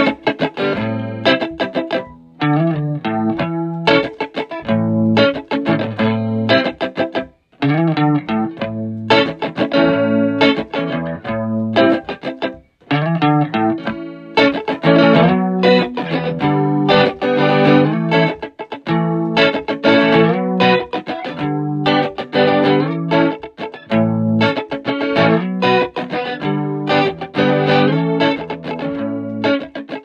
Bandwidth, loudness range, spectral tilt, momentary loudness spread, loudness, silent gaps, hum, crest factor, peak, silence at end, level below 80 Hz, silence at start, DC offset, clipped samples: 7.2 kHz; 4 LU; -7.5 dB/octave; 10 LU; -16 LUFS; none; none; 16 dB; 0 dBFS; 0.05 s; -54 dBFS; 0 s; under 0.1%; under 0.1%